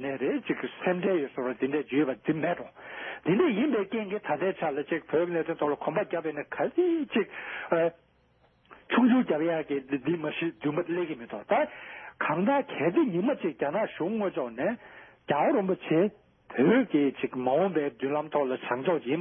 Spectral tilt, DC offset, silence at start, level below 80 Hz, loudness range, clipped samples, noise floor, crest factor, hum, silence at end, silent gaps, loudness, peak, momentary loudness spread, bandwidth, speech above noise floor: -10.5 dB/octave; under 0.1%; 0 s; -72 dBFS; 3 LU; under 0.1%; -65 dBFS; 16 dB; none; 0 s; none; -28 LUFS; -12 dBFS; 8 LU; 3.7 kHz; 37 dB